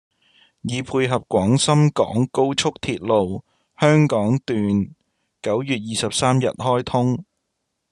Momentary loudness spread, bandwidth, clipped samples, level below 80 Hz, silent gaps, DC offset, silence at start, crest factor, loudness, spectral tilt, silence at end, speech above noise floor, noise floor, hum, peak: 11 LU; 12 kHz; under 0.1%; -56 dBFS; none; under 0.1%; 0.65 s; 20 dB; -20 LUFS; -5.5 dB/octave; 0.7 s; 57 dB; -76 dBFS; none; -2 dBFS